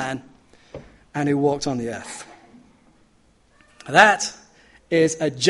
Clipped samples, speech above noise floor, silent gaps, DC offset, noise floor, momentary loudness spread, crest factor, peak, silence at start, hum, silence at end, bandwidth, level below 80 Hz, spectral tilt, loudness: under 0.1%; 39 dB; none; under 0.1%; -58 dBFS; 28 LU; 24 dB; 0 dBFS; 0 s; none; 0 s; 11.5 kHz; -58 dBFS; -4 dB/octave; -20 LUFS